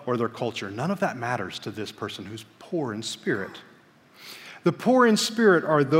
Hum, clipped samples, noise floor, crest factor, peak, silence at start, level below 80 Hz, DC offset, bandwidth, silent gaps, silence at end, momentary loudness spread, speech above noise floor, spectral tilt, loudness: none; under 0.1%; -55 dBFS; 18 dB; -6 dBFS; 0 s; -72 dBFS; under 0.1%; 16 kHz; none; 0 s; 20 LU; 30 dB; -5 dB/octave; -25 LUFS